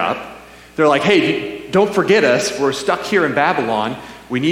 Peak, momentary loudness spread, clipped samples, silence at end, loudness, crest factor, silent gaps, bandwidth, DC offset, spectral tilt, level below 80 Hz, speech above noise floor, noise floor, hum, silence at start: -2 dBFS; 12 LU; under 0.1%; 0 s; -16 LUFS; 16 dB; none; 15.5 kHz; under 0.1%; -4.5 dB/octave; -52 dBFS; 22 dB; -38 dBFS; none; 0 s